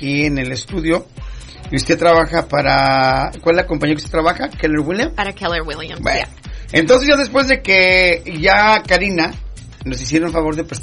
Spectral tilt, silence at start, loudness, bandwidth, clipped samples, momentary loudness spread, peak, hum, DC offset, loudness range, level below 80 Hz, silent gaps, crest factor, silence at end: -4.5 dB/octave; 0 s; -15 LUFS; 11 kHz; under 0.1%; 14 LU; 0 dBFS; none; under 0.1%; 5 LU; -32 dBFS; none; 16 dB; 0 s